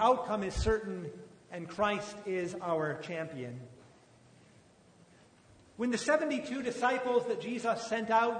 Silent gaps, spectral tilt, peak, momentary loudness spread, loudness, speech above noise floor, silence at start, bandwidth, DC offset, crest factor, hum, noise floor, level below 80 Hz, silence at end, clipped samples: none; -5 dB/octave; -14 dBFS; 15 LU; -33 LUFS; 29 dB; 0 s; 9.6 kHz; under 0.1%; 20 dB; none; -61 dBFS; -52 dBFS; 0 s; under 0.1%